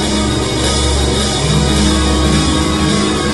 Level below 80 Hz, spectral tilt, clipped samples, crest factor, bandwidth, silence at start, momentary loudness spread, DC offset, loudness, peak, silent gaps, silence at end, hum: -20 dBFS; -4.5 dB/octave; under 0.1%; 12 dB; 12 kHz; 0 s; 2 LU; under 0.1%; -13 LUFS; 0 dBFS; none; 0 s; none